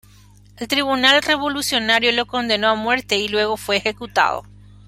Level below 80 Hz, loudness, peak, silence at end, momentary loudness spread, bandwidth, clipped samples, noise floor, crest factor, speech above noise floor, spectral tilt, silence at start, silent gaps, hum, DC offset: -50 dBFS; -18 LUFS; 0 dBFS; 0.45 s; 7 LU; 16 kHz; under 0.1%; -48 dBFS; 20 dB; 29 dB; -2.5 dB/octave; 0.6 s; none; 50 Hz at -45 dBFS; under 0.1%